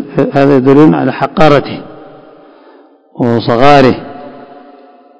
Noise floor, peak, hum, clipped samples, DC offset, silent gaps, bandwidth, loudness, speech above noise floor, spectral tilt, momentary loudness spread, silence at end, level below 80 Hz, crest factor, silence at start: -41 dBFS; 0 dBFS; none; 4%; under 0.1%; none; 8 kHz; -8 LUFS; 34 dB; -7.5 dB/octave; 18 LU; 0.3 s; -40 dBFS; 10 dB; 0 s